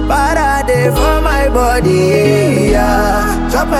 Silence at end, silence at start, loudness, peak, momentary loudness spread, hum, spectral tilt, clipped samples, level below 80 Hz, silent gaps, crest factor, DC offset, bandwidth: 0 s; 0 s; -12 LUFS; 0 dBFS; 3 LU; none; -5.5 dB/octave; under 0.1%; -18 dBFS; none; 10 dB; under 0.1%; 16 kHz